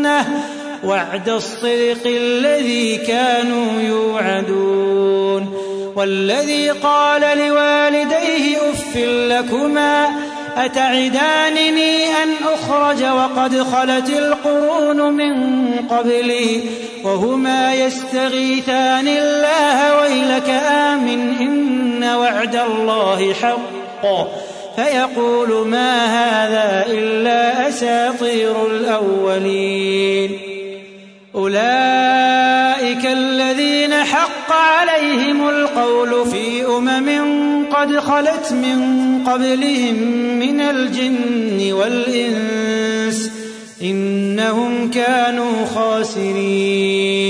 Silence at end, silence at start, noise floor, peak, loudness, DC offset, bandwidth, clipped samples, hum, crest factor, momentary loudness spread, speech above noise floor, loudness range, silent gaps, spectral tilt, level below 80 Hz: 0 s; 0 s; -40 dBFS; -2 dBFS; -16 LUFS; under 0.1%; 11 kHz; under 0.1%; none; 14 dB; 6 LU; 24 dB; 3 LU; none; -4 dB/octave; -58 dBFS